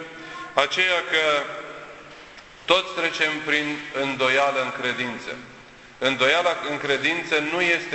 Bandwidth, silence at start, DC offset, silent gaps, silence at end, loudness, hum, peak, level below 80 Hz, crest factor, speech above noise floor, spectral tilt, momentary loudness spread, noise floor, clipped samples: 8.4 kHz; 0 s; under 0.1%; none; 0 s; -22 LUFS; none; -2 dBFS; -62 dBFS; 22 dB; 23 dB; -3 dB/octave; 17 LU; -46 dBFS; under 0.1%